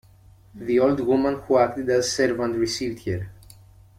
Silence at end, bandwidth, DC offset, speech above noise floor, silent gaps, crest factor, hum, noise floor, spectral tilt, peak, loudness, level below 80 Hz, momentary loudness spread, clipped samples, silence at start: 0.65 s; 15.5 kHz; under 0.1%; 29 dB; none; 18 dB; none; -51 dBFS; -5 dB/octave; -6 dBFS; -23 LUFS; -52 dBFS; 10 LU; under 0.1%; 0.55 s